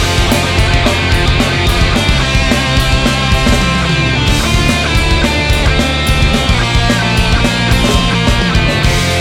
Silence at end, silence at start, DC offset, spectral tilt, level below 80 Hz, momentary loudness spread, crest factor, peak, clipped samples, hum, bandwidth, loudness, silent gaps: 0 s; 0 s; under 0.1%; -4.5 dB/octave; -16 dBFS; 1 LU; 10 dB; 0 dBFS; under 0.1%; none; 17.5 kHz; -11 LUFS; none